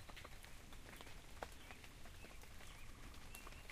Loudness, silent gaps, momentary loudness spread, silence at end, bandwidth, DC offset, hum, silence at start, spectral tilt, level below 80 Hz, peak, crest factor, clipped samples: -57 LUFS; none; 4 LU; 0 s; 15.5 kHz; under 0.1%; none; 0 s; -3.5 dB/octave; -58 dBFS; -30 dBFS; 24 dB; under 0.1%